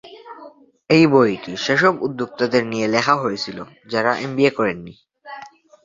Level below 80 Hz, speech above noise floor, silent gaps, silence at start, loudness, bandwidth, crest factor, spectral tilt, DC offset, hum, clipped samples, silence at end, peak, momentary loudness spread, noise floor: -60 dBFS; 26 dB; none; 0.05 s; -18 LUFS; 7.8 kHz; 18 dB; -5.5 dB/octave; under 0.1%; none; under 0.1%; 0.35 s; 0 dBFS; 22 LU; -44 dBFS